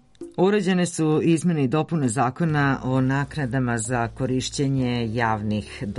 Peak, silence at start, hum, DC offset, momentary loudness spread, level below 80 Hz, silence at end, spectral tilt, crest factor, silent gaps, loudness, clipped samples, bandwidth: -8 dBFS; 0.2 s; none; under 0.1%; 5 LU; -48 dBFS; 0 s; -6 dB/octave; 14 dB; none; -23 LUFS; under 0.1%; 11.5 kHz